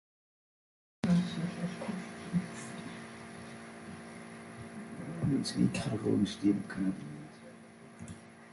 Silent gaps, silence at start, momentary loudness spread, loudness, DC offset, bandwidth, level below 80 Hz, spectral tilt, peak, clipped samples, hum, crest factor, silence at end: none; 1.05 s; 18 LU; -34 LUFS; under 0.1%; 11.5 kHz; -62 dBFS; -6.5 dB/octave; -16 dBFS; under 0.1%; none; 20 dB; 0 s